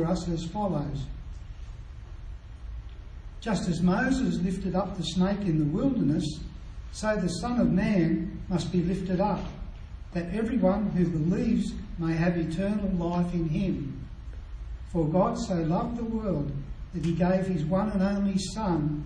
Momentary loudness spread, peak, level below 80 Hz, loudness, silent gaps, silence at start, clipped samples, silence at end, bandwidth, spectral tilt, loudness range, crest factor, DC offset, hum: 18 LU; -10 dBFS; -40 dBFS; -28 LUFS; none; 0 s; under 0.1%; 0 s; 10 kHz; -7 dB/octave; 3 LU; 18 dB; under 0.1%; none